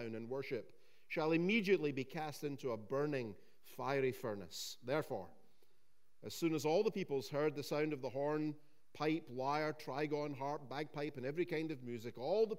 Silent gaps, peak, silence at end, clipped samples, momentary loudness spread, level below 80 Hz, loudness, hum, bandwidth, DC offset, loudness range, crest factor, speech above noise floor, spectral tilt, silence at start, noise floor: none; -22 dBFS; 0 s; under 0.1%; 11 LU; -86 dBFS; -40 LUFS; none; 16 kHz; 0.2%; 3 LU; 18 dB; 42 dB; -5.5 dB/octave; 0 s; -81 dBFS